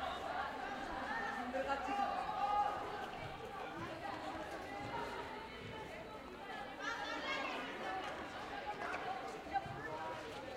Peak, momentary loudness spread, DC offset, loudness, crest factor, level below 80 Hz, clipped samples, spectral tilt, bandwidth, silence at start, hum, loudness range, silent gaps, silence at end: -26 dBFS; 9 LU; under 0.1%; -43 LUFS; 18 dB; -64 dBFS; under 0.1%; -4 dB/octave; 16 kHz; 0 s; none; 6 LU; none; 0 s